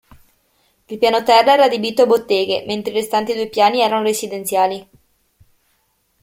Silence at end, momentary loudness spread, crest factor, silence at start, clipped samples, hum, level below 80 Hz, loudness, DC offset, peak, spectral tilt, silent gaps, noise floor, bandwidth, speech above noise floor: 1.4 s; 9 LU; 18 dB; 0.9 s; under 0.1%; none; -60 dBFS; -16 LUFS; under 0.1%; 0 dBFS; -3 dB/octave; none; -64 dBFS; 16.5 kHz; 48 dB